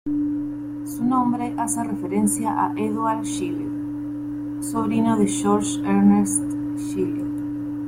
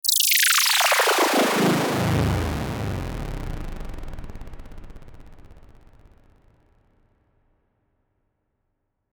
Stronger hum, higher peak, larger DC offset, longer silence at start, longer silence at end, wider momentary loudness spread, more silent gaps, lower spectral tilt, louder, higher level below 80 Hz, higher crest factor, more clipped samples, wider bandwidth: neither; about the same, -6 dBFS vs -6 dBFS; neither; about the same, 0.05 s vs 0.05 s; second, 0 s vs 3.55 s; second, 10 LU vs 23 LU; neither; first, -5.5 dB/octave vs -3 dB/octave; second, -23 LUFS vs -20 LUFS; second, -52 dBFS vs -38 dBFS; about the same, 16 dB vs 18 dB; neither; second, 16 kHz vs over 20 kHz